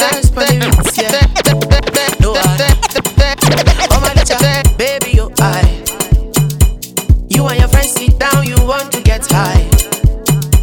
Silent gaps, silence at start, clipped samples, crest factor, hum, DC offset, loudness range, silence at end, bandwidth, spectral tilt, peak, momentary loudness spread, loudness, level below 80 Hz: none; 0 s; 0.9%; 10 dB; none; under 0.1%; 1 LU; 0 s; 19.5 kHz; -4.5 dB/octave; 0 dBFS; 3 LU; -11 LUFS; -14 dBFS